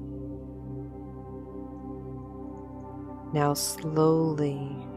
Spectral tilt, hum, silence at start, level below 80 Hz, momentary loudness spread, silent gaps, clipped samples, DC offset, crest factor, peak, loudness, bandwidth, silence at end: -5.5 dB/octave; none; 0 s; -50 dBFS; 17 LU; none; under 0.1%; under 0.1%; 20 dB; -12 dBFS; -30 LUFS; 16 kHz; 0 s